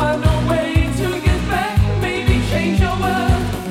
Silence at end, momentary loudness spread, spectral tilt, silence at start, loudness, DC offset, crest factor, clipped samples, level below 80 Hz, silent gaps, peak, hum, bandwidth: 0 s; 2 LU; -6.5 dB/octave; 0 s; -18 LUFS; under 0.1%; 16 dB; under 0.1%; -24 dBFS; none; 0 dBFS; none; 16 kHz